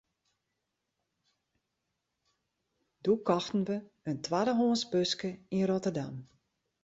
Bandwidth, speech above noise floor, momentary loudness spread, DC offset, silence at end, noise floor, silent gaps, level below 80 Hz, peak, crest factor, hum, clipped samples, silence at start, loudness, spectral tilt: 8 kHz; 53 dB; 10 LU; under 0.1%; 0.6 s; -84 dBFS; none; -72 dBFS; -14 dBFS; 20 dB; none; under 0.1%; 3.05 s; -32 LUFS; -5.5 dB/octave